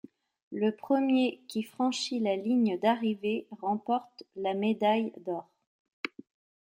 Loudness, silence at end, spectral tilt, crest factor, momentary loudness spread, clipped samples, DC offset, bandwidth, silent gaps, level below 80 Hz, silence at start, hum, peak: -30 LUFS; 0.6 s; -5.5 dB/octave; 16 dB; 13 LU; under 0.1%; under 0.1%; 16.5 kHz; 5.67-5.85 s, 5.93-6.04 s; -82 dBFS; 0.5 s; none; -14 dBFS